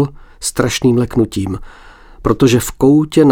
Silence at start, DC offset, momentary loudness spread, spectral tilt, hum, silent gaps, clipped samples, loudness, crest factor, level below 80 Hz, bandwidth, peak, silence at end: 0 s; under 0.1%; 11 LU; -6 dB/octave; none; none; under 0.1%; -14 LUFS; 14 dB; -34 dBFS; 18.5 kHz; 0 dBFS; 0 s